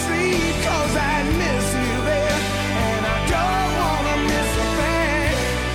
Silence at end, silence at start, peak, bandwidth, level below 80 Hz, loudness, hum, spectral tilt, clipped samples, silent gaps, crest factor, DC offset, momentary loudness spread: 0 s; 0 s; -8 dBFS; 17 kHz; -28 dBFS; -20 LUFS; none; -4.5 dB/octave; under 0.1%; none; 12 dB; under 0.1%; 2 LU